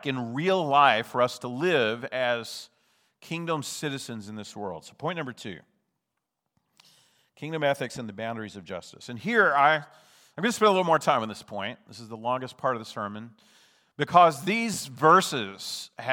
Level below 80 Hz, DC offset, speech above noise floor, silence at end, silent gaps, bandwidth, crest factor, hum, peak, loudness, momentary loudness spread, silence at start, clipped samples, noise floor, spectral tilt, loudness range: -76 dBFS; under 0.1%; 56 dB; 0 s; none; over 20 kHz; 24 dB; none; -4 dBFS; -26 LUFS; 19 LU; 0.05 s; under 0.1%; -83 dBFS; -4 dB/octave; 10 LU